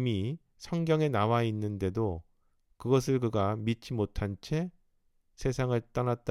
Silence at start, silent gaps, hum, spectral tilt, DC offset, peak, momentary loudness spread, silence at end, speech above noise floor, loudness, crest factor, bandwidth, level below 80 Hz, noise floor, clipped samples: 0 s; none; none; -7 dB/octave; under 0.1%; -12 dBFS; 9 LU; 0 s; 40 dB; -31 LUFS; 18 dB; 14.5 kHz; -50 dBFS; -70 dBFS; under 0.1%